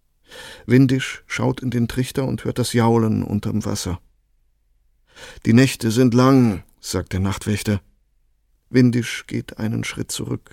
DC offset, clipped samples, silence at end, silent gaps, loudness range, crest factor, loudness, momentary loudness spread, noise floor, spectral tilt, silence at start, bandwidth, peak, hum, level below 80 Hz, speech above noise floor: under 0.1%; under 0.1%; 0.15 s; none; 4 LU; 18 dB; -20 LUFS; 12 LU; -62 dBFS; -6 dB/octave; 0.3 s; 16.5 kHz; -2 dBFS; none; -46 dBFS; 43 dB